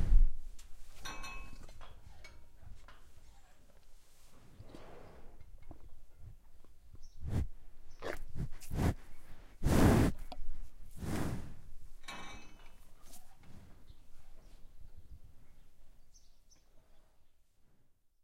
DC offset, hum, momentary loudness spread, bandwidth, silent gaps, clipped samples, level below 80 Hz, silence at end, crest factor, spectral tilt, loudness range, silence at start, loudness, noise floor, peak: under 0.1%; none; 27 LU; 15.5 kHz; none; under 0.1%; -40 dBFS; 0.6 s; 24 dB; -6.5 dB/octave; 24 LU; 0 s; -37 LUFS; -65 dBFS; -12 dBFS